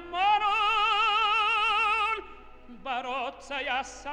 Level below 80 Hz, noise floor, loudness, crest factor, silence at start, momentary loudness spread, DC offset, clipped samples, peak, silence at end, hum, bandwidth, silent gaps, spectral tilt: -54 dBFS; -47 dBFS; -26 LUFS; 14 dB; 0 s; 11 LU; under 0.1%; under 0.1%; -14 dBFS; 0 s; none; 9.8 kHz; none; -1 dB/octave